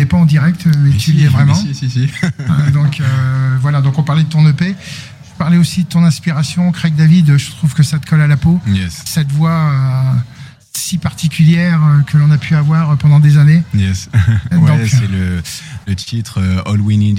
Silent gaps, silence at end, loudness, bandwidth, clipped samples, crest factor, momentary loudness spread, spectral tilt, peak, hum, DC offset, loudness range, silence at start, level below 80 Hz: none; 0 s; -12 LUFS; 15 kHz; under 0.1%; 10 dB; 9 LU; -6.5 dB/octave; 0 dBFS; none; under 0.1%; 4 LU; 0 s; -40 dBFS